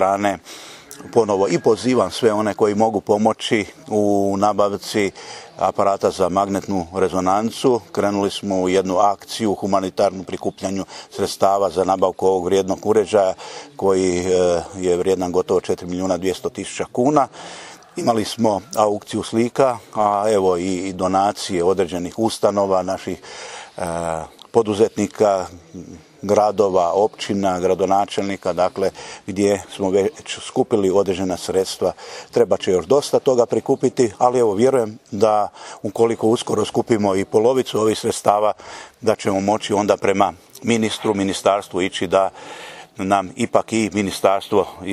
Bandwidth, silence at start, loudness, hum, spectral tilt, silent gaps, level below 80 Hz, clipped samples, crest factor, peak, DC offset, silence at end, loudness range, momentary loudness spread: 15 kHz; 0 s; -19 LUFS; none; -5 dB/octave; none; -56 dBFS; under 0.1%; 18 dB; 0 dBFS; under 0.1%; 0 s; 3 LU; 10 LU